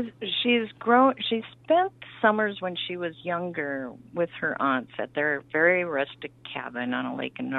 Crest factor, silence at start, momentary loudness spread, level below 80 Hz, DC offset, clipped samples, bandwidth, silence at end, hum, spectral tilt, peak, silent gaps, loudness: 20 dB; 0 s; 11 LU; -70 dBFS; under 0.1%; under 0.1%; 4.3 kHz; 0 s; none; -7.5 dB/octave; -6 dBFS; none; -26 LUFS